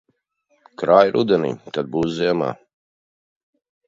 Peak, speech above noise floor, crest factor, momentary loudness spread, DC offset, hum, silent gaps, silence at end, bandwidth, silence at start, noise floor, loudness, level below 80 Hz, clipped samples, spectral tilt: 0 dBFS; 48 dB; 22 dB; 12 LU; under 0.1%; none; none; 1.35 s; 7.6 kHz; 0.8 s; -66 dBFS; -19 LUFS; -60 dBFS; under 0.1%; -7 dB/octave